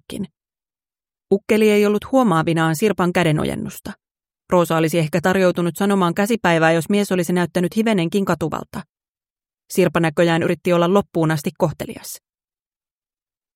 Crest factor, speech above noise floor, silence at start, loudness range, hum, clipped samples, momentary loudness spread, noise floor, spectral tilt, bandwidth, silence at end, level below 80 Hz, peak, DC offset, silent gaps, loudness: 18 dB; over 72 dB; 0.1 s; 3 LU; none; under 0.1%; 15 LU; under -90 dBFS; -6 dB/octave; 16.5 kHz; 1.4 s; -52 dBFS; -2 dBFS; under 0.1%; 4.11-4.15 s, 8.89-8.94 s, 9.08-9.15 s, 9.30-9.36 s; -18 LUFS